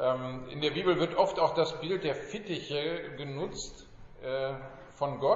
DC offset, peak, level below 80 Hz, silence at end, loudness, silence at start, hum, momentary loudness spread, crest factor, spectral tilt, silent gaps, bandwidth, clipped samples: under 0.1%; -10 dBFS; -56 dBFS; 0 s; -32 LUFS; 0 s; none; 12 LU; 22 dB; -3.5 dB/octave; none; 7.6 kHz; under 0.1%